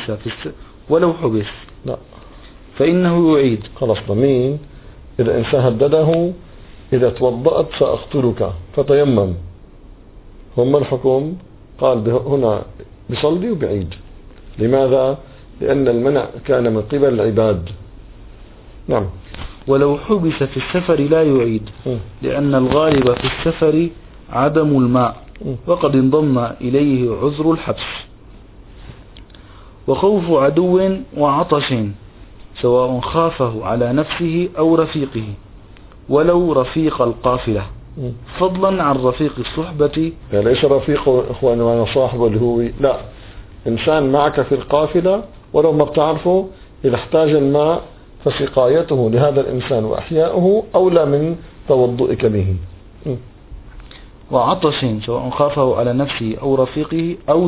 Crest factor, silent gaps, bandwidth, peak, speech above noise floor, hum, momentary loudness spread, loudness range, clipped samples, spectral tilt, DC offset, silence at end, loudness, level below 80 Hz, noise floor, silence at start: 16 dB; none; 4 kHz; 0 dBFS; 24 dB; none; 13 LU; 3 LU; under 0.1%; -11.5 dB/octave; under 0.1%; 0 s; -16 LUFS; -38 dBFS; -40 dBFS; 0 s